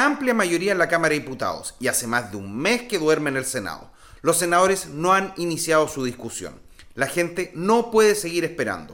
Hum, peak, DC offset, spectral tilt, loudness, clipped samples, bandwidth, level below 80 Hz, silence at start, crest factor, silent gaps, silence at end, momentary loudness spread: none; -6 dBFS; under 0.1%; -3.5 dB/octave; -22 LUFS; under 0.1%; 17 kHz; -54 dBFS; 0 s; 16 dB; none; 0 s; 11 LU